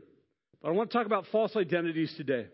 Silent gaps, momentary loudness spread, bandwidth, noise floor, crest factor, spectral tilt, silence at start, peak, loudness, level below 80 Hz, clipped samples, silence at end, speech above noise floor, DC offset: none; 5 LU; 5.8 kHz; -69 dBFS; 18 dB; -10 dB/octave; 0.65 s; -12 dBFS; -30 LUFS; -80 dBFS; under 0.1%; 0.05 s; 39 dB; under 0.1%